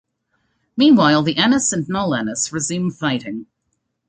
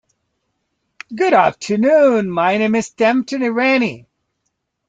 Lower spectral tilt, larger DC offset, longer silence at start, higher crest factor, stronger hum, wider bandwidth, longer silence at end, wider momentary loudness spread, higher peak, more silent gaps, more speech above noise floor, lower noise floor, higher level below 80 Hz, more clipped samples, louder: second, -4 dB/octave vs -5.5 dB/octave; neither; second, 0.75 s vs 1.1 s; about the same, 16 dB vs 16 dB; neither; about the same, 9.4 kHz vs 9.2 kHz; second, 0.65 s vs 0.9 s; first, 13 LU vs 7 LU; about the same, -2 dBFS vs -2 dBFS; neither; about the same, 55 dB vs 58 dB; about the same, -72 dBFS vs -73 dBFS; first, -56 dBFS vs -62 dBFS; neither; about the same, -17 LUFS vs -15 LUFS